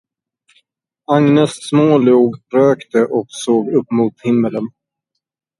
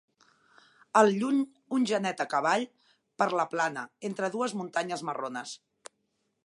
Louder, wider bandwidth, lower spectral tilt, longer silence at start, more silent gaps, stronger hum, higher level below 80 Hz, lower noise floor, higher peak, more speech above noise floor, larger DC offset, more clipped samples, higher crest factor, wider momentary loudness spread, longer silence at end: first, -14 LUFS vs -29 LUFS; about the same, 11.5 kHz vs 11.5 kHz; first, -7 dB/octave vs -4.5 dB/octave; first, 1.1 s vs 0.95 s; neither; neither; first, -62 dBFS vs -84 dBFS; about the same, -77 dBFS vs -77 dBFS; first, 0 dBFS vs -8 dBFS; first, 63 dB vs 49 dB; neither; neither; second, 16 dB vs 22 dB; second, 7 LU vs 13 LU; about the same, 0.9 s vs 0.9 s